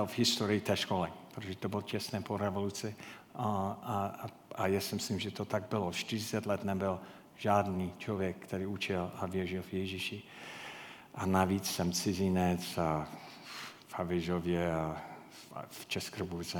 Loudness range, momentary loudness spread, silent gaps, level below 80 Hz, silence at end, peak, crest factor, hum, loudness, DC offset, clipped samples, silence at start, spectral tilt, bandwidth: 4 LU; 15 LU; none; -64 dBFS; 0 s; -12 dBFS; 22 dB; none; -35 LUFS; under 0.1%; under 0.1%; 0 s; -5 dB/octave; 19 kHz